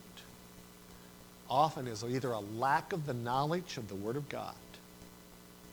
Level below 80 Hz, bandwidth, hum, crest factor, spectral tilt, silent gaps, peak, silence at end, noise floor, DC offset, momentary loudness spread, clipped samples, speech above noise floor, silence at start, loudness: -66 dBFS; over 20 kHz; 60 Hz at -60 dBFS; 22 dB; -5.5 dB/octave; none; -16 dBFS; 0 s; -55 dBFS; under 0.1%; 22 LU; under 0.1%; 20 dB; 0 s; -36 LUFS